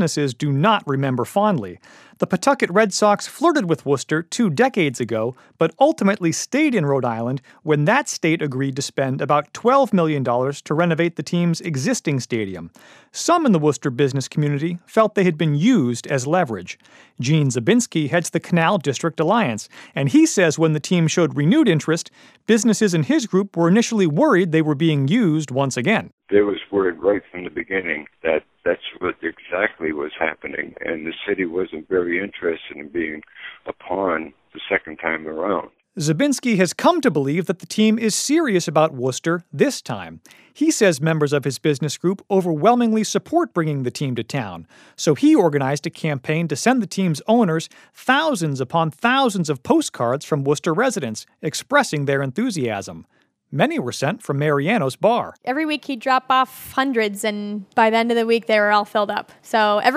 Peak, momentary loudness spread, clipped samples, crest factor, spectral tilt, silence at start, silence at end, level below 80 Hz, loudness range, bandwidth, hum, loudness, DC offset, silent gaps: 0 dBFS; 10 LU; under 0.1%; 18 dB; -5.5 dB/octave; 0 s; 0 s; -62 dBFS; 6 LU; 15.5 kHz; none; -20 LUFS; under 0.1%; 26.13-26.18 s